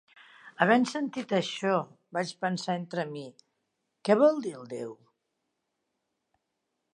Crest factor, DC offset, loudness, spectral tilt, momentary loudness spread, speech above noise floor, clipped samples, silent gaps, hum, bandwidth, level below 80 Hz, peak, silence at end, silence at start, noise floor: 24 dB; under 0.1%; -29 LUFS; -5.5 dB/octave; 16 LU; 54 dB; under 0.1%; none; none; 11 kHz; -84 dBFS; -6 dBFS; 2 s; 0.45 s; -82 dBFS